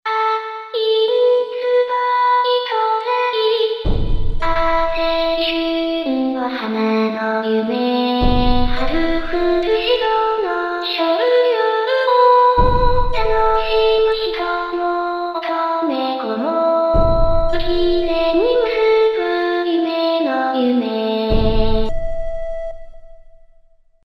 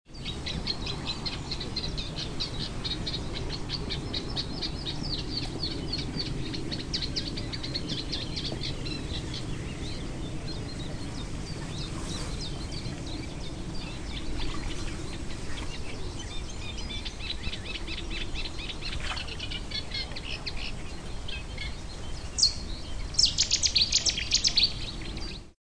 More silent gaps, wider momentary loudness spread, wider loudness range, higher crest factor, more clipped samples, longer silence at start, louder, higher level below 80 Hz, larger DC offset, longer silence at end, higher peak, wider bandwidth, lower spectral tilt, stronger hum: neither; second, 6 LU vs 14 LU; second, 4 LU vs 11 LU; second, 16 dB vs 22 dB; neither; about the same, 0.05 s vs 0.05 s; first, -17 LUFS vs -31 LUFS; first, -26 dBFS vs -38 dBFS; second, under 0.1% vs 0.1%; first, 0.9 s vs 0.1 s; first, 0 dBFS vs -10 dBFS; second, 6 kHz vs 10.5 kHz; first, -7 dB/octave vs -3 dB/octave; neither